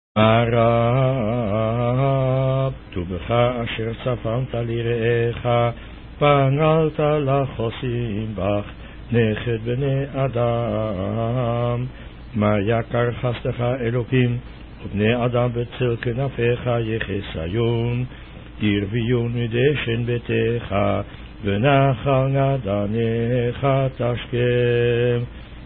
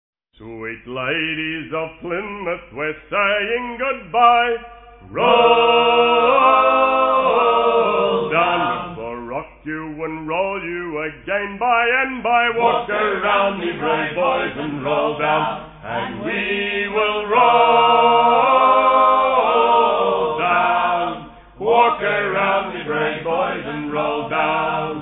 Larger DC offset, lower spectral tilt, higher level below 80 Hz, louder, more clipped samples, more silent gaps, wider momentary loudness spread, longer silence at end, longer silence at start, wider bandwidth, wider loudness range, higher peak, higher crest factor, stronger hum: neither; first, -12 dB/octave vs -8 dB/octave; first, -40 dBFS vs -50 dBFS; second, -21 LUFS vs -17 LUFS; neither; neither; second, 9 LU vs 14 LU; about the same, 0 s vs 0 s; second, 0.15 s vs 0.4 s; about the same, 4.1 kHz vs 4.1 kHz; second, 3 LU vs 8 LU; about the same, -4 dBFS vs -2 dBFS; about the same, 16 dB vs 16 dB; neither